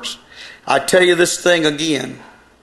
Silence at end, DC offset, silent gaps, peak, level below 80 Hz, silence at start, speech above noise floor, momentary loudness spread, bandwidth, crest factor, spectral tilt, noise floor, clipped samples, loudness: 0.4 s; under 0.1%; none; 0 dBFS; -56 dBFS; 0 s; 24 dB; 20 LU; 13 kHz; 16 dB; -3 dB/octave; -39 dBFS; under 0.1%; -15 LUFS